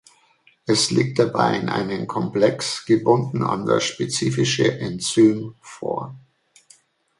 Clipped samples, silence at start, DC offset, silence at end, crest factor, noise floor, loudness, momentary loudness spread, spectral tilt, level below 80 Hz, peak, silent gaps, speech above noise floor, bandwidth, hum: under 0.1%; 0.65 s; under 0.1%; 1 s; 18 dB; -58 dBFS; -21 LUFS; 11 LU; -5 dB/octave; -60 dBFS; -2 dBFS; none; 38 dB; 11.5 kHz; none